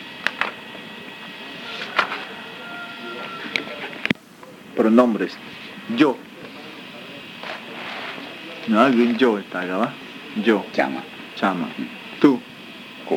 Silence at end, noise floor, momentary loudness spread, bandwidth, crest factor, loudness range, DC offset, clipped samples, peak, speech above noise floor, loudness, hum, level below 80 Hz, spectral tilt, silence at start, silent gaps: 0 s; -43 dBFS; 19 LU; 16.5 kHz; 24 dB; 7 LU; under 0.1%; under 0.1%; 0 dBFS; 24 dB; -22 LUFS; none; -70 dBFS; -5.5 dB/octave; 0 s; none